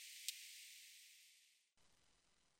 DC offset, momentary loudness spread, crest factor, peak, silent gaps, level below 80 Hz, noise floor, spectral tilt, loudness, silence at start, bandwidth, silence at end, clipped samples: under 0.1%; 16 LU; 38 dB; -22 dBFS; none; under -90 dBFS; -80 dBFS; 4 dB/octave; -54 LUFS; 0 s; 16 kHz; 0.05 s; under 0.1%